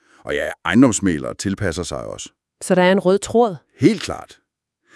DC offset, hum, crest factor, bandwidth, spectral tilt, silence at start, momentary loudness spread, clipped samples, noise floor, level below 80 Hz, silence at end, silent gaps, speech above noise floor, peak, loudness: under 0.1%; none; 18 dB; 12 kHz; -5 dB/octave; 0.25 s; 17 LU; under 0.1%; -65 dBFS; -48 dBFS; 0.7 s; none; 46 dB; 0 dBFS; -18 LUFS